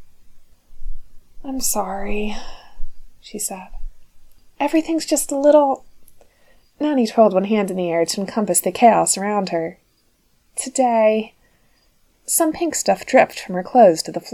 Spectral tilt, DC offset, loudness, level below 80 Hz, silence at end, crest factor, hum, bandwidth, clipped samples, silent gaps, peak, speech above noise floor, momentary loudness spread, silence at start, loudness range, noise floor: -3.5 dB/octave; under 0.1%; -18 LUFS; -38 dBFS; 0 s; 20 dB; none; 18 kHz; under 0.1%; none; 0 dBFS; 43 dB; 15 LU; 0 s; 9 LU; -61 dBFS